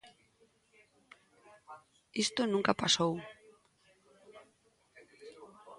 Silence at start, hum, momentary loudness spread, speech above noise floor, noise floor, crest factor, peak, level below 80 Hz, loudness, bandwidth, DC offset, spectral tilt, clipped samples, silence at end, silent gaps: 0.05 s; none; 26 LU; 39 dB; -71 dBFS; 26 dB; -12 dBFS; -74 dBFS; -31 LUFS; 11.5 kHz; under 0.1%; -3 dB/octave; under 0.1%; 0.05 s; none